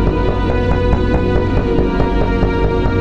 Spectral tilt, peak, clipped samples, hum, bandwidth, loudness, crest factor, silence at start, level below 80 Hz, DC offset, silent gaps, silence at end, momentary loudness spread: -8.5 dB/octave; 0 dBFS; under 0.1%; none; 6.8 kHz; -16 LUFS; 14 dB; 0 s; -18 dBFS; 3%; none; 0 s; 1 LU